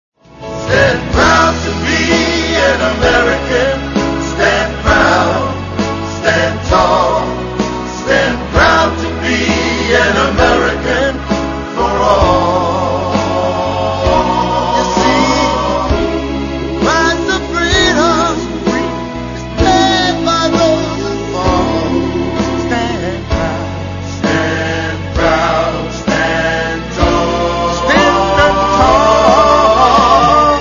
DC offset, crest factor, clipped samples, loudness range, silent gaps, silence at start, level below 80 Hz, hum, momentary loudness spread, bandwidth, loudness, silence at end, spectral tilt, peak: under 0.1%; 12 dB; under 0.1%; 4 LU; none; 0.35 s; -26 dBFS; none; 9 LU; 7.4 kHz; -12 LUFS; 0 s; -4.5 dB/octave; 0 dBFS